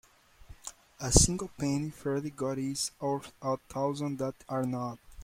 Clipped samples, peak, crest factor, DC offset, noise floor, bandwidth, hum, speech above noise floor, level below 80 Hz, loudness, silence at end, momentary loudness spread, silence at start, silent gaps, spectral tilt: under 0.1%; -4 dBFS; 28 dB; under 0.1%; -54 dBFS; 16.5 kHz; none; 23 dB; -44 dBFS; -31 LUFS; 0 s; 16 LU; 0.4 s; none; -4.5 dB/octave